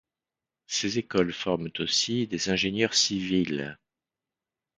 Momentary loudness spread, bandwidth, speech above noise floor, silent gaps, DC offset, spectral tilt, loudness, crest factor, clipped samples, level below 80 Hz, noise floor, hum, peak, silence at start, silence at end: 7 LU; 9.6 kHz; over 63 dB; none; under 0.1%; -3 dB/octave; -26 LUFS; 22 dB; under 0.1%; -58 dBFS; under -90 dBFS; none; -8 dBFS; 0.7 s; 1.05 s